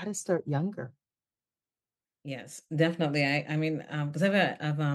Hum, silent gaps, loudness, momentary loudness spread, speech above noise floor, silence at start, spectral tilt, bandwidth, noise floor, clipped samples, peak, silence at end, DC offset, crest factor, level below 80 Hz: none; none; -29 LUFS; 15 LU; over 61 dB; 0 s; -5.5 dB/octave; 12.5 kHz; under -90 dBFS; under 0.1%; -12 dBFS; 0 s; under 0.1%; 20 dB; -80 dBFS